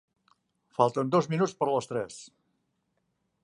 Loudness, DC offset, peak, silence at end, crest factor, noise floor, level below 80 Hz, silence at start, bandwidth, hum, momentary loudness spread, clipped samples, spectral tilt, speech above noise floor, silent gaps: -28 LUFS; under 0.1%; -8 dBFS; 1.2 s; 22 dB; -77 dBFS; -74 dBFS; 0.8 s; 11.5 kHz; none; 15 LU; under 0.1%; -6.5 dB/octave; 50 dB; none